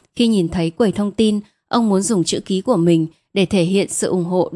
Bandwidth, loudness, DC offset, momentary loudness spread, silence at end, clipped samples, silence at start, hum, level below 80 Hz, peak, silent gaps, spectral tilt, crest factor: 12 kHz; -18 LUFS; under 0.1%; 5 LU; 0 s; under 0.1%; 0.15 s; none; -50 dBFS; -2 dBFS; none; -5.5 dB/octave; 14 dB